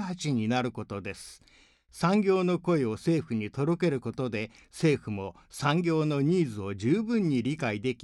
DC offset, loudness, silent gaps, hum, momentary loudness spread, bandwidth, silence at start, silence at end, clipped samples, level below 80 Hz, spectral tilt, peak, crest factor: under 0.1%; -29 LUFS; none; none; 11 LU; 12 kHz; 0 s; 0.1 s; under 0.1%; -62 dBFS; -6.5 dB/octave; -12 dBFS; 16 dB